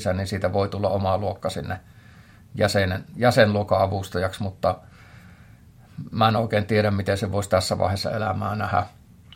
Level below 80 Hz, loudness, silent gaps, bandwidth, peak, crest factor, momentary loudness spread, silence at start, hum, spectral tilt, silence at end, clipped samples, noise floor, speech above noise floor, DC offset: -54 dBFS; -23 LUFS; none; 16.5 kHz; -2 dBFS; 22 dB; 13 LU; 0 s; none; -6 dB/octave; 0 s; under 0.1%; -49 dBFS; 26 dB; under 0.1%